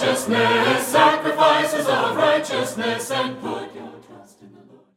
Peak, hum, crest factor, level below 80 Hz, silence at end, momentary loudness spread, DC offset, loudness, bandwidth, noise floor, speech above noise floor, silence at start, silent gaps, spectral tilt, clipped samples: -2 dBFS; none; 18 dB; -66 dBFS; 0.5 s; 14 LU; under 0.1%; -19 LUFS; 16.5 kHz; -48 dBFS; 28 dB; 0 s; none; -3.5 dB/octave; under 0.1%